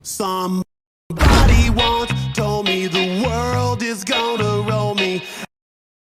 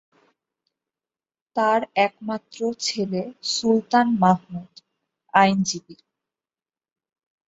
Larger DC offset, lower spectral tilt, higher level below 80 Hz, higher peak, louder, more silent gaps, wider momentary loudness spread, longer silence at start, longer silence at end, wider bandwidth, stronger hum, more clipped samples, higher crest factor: neither; about the same, -5 dB/octave vs -4.5 dB/octave; first, -24 dBFS vs -68 dBFS; about the same, -2 dBFS vs -2 dBFS; first, -18 LUFS vs -22 LUFS; first, 0.87-1.10 s vs none; about the same, 12 LU vs 13 LU; second, 0.05 s vs 1.55 s; second, 0.6 s vs 1.55 s; first, 16 kHz vs 8 kHz; neither; neither; second, 16 dB vs 22 dB